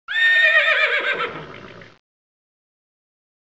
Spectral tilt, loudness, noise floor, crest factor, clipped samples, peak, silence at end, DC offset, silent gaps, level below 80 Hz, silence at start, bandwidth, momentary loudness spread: -2 dB/octave; -15 LUFS; -40 dBFS; 16 dB; under 0.1%; -6 dBFS; 1.7 s; 0.2%; none; -64 dBFS; 0.1 s; 8 kHz; 14 LU